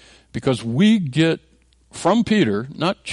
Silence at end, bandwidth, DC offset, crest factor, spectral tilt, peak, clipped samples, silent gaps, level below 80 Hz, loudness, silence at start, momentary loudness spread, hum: 0 s; 11.5 kHz; under 0.1%; 14 dB; -6 dB/octave; -6 dBFS; under 0.1%; none; -52 dBFS; -19 LUFS; 0.35 s; 10 LU; none